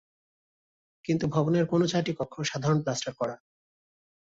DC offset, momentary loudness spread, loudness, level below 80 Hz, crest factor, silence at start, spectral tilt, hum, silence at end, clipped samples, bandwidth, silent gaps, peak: under 0.1%; 9 LU; -28 LUFS; -62 dBFS; 18 dB; 1.1 s; -6 dB/octave; none; 0.9 s; under 0.1%; 7.8 kHz; none; -12 dBFS